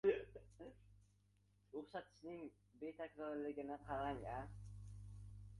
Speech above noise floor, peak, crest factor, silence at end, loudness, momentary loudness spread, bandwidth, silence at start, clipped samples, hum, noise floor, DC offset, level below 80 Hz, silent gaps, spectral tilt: 27 dB; -26 dBFS; 22 dB; 0 s; -50 LUFS; 14 LU; 11 kHz; 0.05 s; under 0.1%; 50 Hz at -65 dBFS; -76 dBFS; under 0.1%; -64 dBFS; none; -7.5 dB/octave